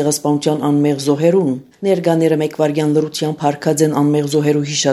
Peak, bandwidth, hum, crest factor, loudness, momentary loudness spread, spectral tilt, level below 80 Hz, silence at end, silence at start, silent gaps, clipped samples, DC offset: 0 dBFS; 13.5 kHz; none; 14 dB; -16 LUFS; 4 LU; -5.5 dB/octave; -64 dBFS; 0 s; 0 s; none; under 0.1%; under 0.1%